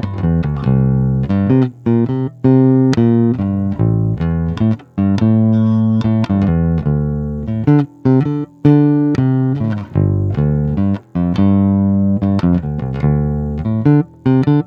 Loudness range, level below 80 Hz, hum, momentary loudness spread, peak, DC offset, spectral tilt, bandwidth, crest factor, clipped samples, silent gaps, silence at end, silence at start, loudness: 1 LU; -32 dBFS; none; 6 LU; 0 dBFS; under 0.1%; -10 dB/octave; 7 kHz; 14 dB; under 0.1%; none; 0.05 s; 0 s; -15 LUFS